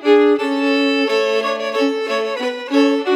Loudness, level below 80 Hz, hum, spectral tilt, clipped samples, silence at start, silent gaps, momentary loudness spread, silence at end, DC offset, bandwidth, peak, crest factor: -17 LUFS; -86 dBFS; none; -3 dB/octave; under 0.1%; 0 s; none; 6 LU; 0 s; under 0.1%; 11.5 kHz; -2 dBFS; 14 dB